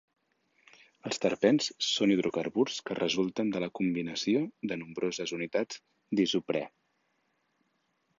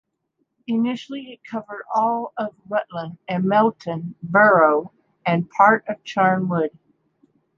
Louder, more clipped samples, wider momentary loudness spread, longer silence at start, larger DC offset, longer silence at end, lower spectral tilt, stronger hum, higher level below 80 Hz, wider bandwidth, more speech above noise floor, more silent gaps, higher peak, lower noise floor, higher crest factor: second, -30 LUFS vs -20 LUFS; neither; second, 10 LU vs 16 LU; first, 1.05 s vs 0.7 s; neither; first, 1.5 s vs 0.9 s; second, -4.5 dB/octave vs -7.5 dB/octave; neither; about the same, -72 dBFS vs -68 dBFS; about the same, 7.6 kHz vs 7.4 kHz; second, 46 dB vs 52 dB; neither; second, -10 dBFS vs 0 dBFS; about the same, -76 dBFS vs -73 dBFS; about the same, 22 dB vs 20 dB